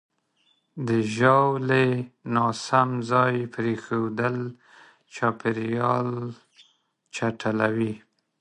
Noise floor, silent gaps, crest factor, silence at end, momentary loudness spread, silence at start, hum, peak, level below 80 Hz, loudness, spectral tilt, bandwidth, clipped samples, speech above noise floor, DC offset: -68 dBFS; none; 22 dB; 0.45 s; 13 LU; 0.75 s; none; -4 dBFS; -66 dBFS; -24 LUFS; -6.5 dB/octave; 10.5 kHz; under 0.1%; 44 dB; under 0.1%